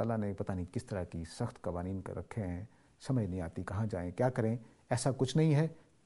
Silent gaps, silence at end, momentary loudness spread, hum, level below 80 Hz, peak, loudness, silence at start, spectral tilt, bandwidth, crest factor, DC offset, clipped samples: none; 0.25 s; 11 LU; none; -58 dBFS; -16 dBFS; -36 LUFS; 0 s; -7 dB/octave; 11.5 kHz; 20 dB; under 0.1%; under 0.1%